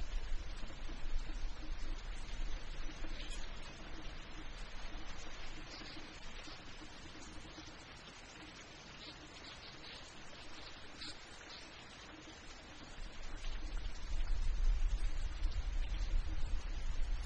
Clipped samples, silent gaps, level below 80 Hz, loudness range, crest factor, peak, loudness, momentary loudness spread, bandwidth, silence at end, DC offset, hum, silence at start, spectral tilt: under 0.1%; none; -42 dBFS; 8 LU; 16 dB; -24 dBFS; -48 LUFS; 9 LU; 8.6 kHz; 0 s; under 0.1%; none; 0 s; -4 dB/octave